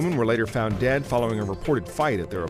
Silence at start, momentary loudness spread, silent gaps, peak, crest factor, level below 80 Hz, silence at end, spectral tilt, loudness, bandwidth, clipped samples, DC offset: 0 s; 3 LU; none; -10 dBFS; 14 dB; -44 dBFS; 0 s; -6.5 dB/octave; -24 LUFS; 15.5 kHz; under 0.1%; under 0.1%